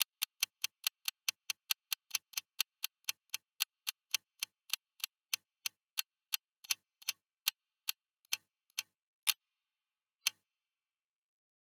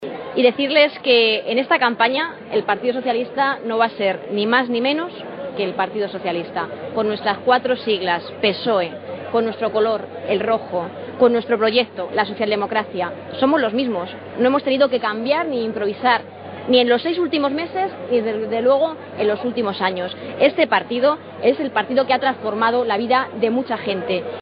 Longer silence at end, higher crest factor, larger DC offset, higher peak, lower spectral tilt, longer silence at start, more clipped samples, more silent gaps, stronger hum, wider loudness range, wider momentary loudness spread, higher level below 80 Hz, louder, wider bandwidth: first, 1.45 s vs 0 s; first, 32 dB vs 18 dB; neither; second, -12 dBFS vs -2 dBFS; second, 5.5 dB/octave vs -2 dB/octave; about the same, 0 s vs 0 s; neither; first, 9.03-9.27 s vs none; neither; about the same, 2 LU vs 3 LU; about the same, 7 LU vs 8 LU; second, under -90 dBFS vs -68 dBFS; second, -39 LUFS vs -19 LUFS; first, over 20 kHz vs 5.2 kHz